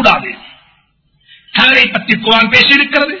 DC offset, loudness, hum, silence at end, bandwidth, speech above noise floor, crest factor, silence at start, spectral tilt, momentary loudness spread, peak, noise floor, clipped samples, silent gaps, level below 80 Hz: under 0.1%; -8 LUFS; none; 0 s; 6 kHz; 45 dB; 12 dB; 0 s; -4 dB/octave; 11 LU; 0 dBFS; -56 dBFS; 0.8%; none; -46 dBFS